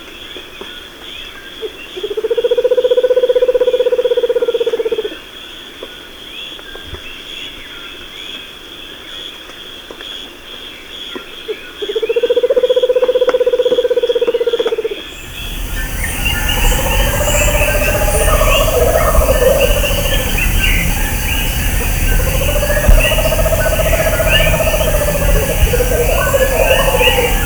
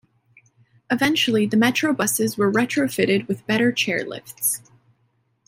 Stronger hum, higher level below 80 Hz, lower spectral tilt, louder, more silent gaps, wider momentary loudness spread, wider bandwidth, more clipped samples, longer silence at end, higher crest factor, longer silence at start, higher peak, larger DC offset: neither; first, -20 dBFS vs -64 dBFS; about the same, -3.5 dB/octave vs -3.5 dB/octave; first, -13 LUFS vs -20 LUFS; neither; first, 17 LU vs 6 LU; first, over 20 kHz vs 16 kHz; neither; second, 0 s vs 0.9 s; about the same, 14 dB vs 18 dB; second, 0 s vs 0.9 s; first, 0 dBFS vs -4 dBFS; neither